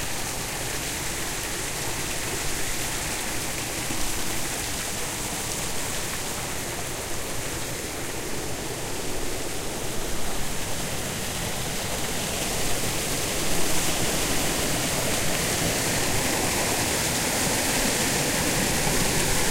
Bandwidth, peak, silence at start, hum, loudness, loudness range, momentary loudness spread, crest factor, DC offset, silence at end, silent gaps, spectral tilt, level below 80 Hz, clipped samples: 16 kHz; -8 dBFS; 0 s; none; -26 LUFS; 7 LU; 8 LU; 18 dB; under 0.1%; 0 s; none; -2.5 dB/octave; -38 dBFS; under 0.1%